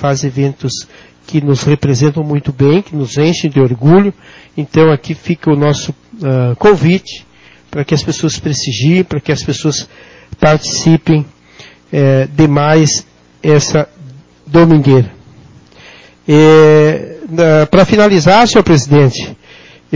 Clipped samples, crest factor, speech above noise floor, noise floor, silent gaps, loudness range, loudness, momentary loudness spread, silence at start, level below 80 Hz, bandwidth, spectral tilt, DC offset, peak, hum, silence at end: 0.2%; 10 dB; 30 dB; -39 dBFS; none; 6 LU; -10 LUFS; 13 LU; 0 s; -40 dBFS; 7.6 kHz; -6 dB/octave; under 0.1%; 0 dBFS; none; 0 s